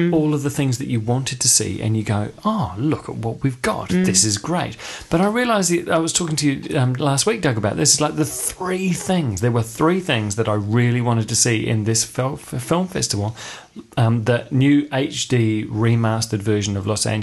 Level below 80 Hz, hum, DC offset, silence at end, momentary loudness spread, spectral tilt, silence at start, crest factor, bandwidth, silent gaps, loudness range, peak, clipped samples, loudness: -46 dBFS; none; under 0.1%; 0 s; 7 LU; -4.5 dB/octave; 0 s; 16 dB; 12.5 kHz; none; 2 LU; -2 dBFS; under 0.1%; -19 LUFS